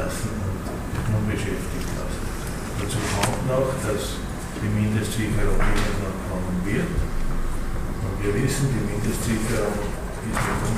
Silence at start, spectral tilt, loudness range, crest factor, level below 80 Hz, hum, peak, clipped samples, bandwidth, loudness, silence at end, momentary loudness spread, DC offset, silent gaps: 0 s; -5.5 dB/octave; 2 LU; 18 dB; -28 dBFS; none; -6 dBFS; under 0.1%; 15.5 kHz; -26 LUFS; 0 s; 7 LU; under 0.1%; none